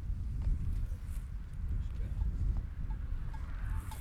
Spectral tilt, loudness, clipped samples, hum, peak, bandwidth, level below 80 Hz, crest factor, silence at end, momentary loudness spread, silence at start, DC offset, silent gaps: -7.5 dB/octave; -40 LUFS; under 0.1%; none; -22 dBFS; 13.5 kHz; -36 dBFS; 12 dB; 0 s; 6 LU; 0 s; under 0.1%; none